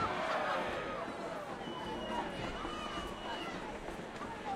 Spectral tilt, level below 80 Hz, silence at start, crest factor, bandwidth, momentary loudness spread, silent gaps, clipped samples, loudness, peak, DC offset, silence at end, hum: -4.5 dB/octave; -56 dBFS; 0 s; 16 dB; 16 kHz; 9 LU; none; under 0.1%; -40 LUFS; -24 dBFS; under 0.1%; 0 s; none